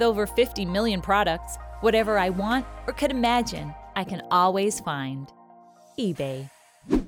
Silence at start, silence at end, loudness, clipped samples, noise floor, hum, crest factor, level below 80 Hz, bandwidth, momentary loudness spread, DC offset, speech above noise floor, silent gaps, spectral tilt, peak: 0 s; 0 s; -25 LUFS; under 0.1%; -52 dBFS; none; 16 dB; -42 dBFS; over 20 kHz; 14 LU; under 0.1%; 28 dB; none; -4.5 dB/octave; -8 dBFS